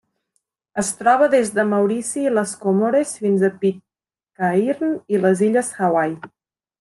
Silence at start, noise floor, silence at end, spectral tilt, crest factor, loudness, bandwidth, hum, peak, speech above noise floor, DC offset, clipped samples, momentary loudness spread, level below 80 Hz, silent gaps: 0.75 s; -90 dBFS; 0.55 s; -5.5 dB/octave; 18 dB; -19 LUFS; 12.5 kHz; none; -2 dBFS; 72 dB; under 0.1%; under 0.1%; 8 LU; -66 dBFS; none